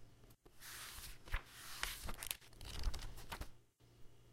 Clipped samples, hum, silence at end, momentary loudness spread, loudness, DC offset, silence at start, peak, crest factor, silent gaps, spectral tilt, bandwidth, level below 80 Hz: under 0.1%; none; 0 s; 21 LU; -49 LUFS; under 0.1%; 0 s; -16 dBFS; 32 dB; none; -2 dB/octave; 16.5 kHz; -50 dBFS